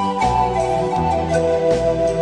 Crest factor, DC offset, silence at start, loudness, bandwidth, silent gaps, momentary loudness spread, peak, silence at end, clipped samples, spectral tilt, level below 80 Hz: 12 dB; under 0.1%; 0 s; -18 LUFS; 10.5 kHz; none; 2 LU; -6 dBFS; 0 s; under 0.1%; -6 dB/octave; -34 dBFS